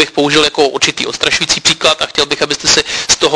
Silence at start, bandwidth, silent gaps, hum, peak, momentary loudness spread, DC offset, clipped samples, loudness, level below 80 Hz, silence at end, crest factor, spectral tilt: 0 s; 11 kHz; none; none; 0 dBFS; 3 LU; under 0.1%; 0.3%; -11 LUFS; -42 dBFS; 0 s; 12 dB; -1.5 dB/octave